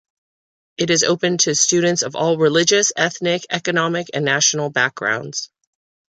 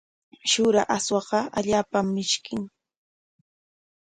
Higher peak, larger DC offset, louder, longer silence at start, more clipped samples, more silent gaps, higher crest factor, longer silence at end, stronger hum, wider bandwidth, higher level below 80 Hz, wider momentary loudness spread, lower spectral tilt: first, -2 dBFS vs -8 dBFS; neither; first, -17 LUFS vs -24 LUFS; first, 0.8 s vs 0.45 s; neither; neither; about the same, 18 dB vs 18 dB; second, 0.7 s vs 1.45 s; neither; about the same, 10.5 kHz vs 11 kHz; about the same, -64 dBFS vs -60 dBFS; about the same, 9 LU vs 11 LU; about the same, -2.5 dB/octave vs -3.5 dB/octave